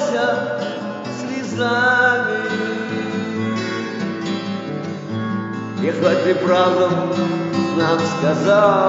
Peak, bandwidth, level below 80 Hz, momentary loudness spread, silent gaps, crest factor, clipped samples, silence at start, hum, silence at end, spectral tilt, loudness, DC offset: -4 dBFS; 8 kHz; -64 dBFS; 11 LU; none; 16 dB; under 0.1%; 0 s; none; 0 s; -4 dB/octave; -19 LUFS; under 0.1%